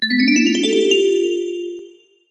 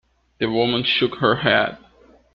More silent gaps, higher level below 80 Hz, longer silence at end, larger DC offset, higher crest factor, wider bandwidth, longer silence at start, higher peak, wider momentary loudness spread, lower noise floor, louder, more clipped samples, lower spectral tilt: neither; second, -70 dBFS vs -54 dBFS; second, 0.4 s vs 0.6 s; neither; about the same, 14 dB vs 18 dB; first, 8.6 kHz vs 6.4 kHz; second, 0 s vs 0.4 s; about the same, -2 dBFS vs -4 dBFS; first, 14 LU vs 8 LU; second, -43 dBFS vs -52 dBFS; first, -16 LUFS vs -19 LUFS; neither; second, -3 dB/octave vs -7.5 dB/octave